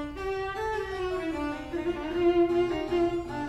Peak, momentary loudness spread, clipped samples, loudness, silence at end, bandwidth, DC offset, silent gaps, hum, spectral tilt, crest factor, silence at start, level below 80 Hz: -14 dBFS; 8 LU; under 0.1%; -29 LUFS; 0 s; 9.8 kHz; under 0.1%; none; none; -6.5 dB/octave; 14 dB; 0 s; -46 dBFS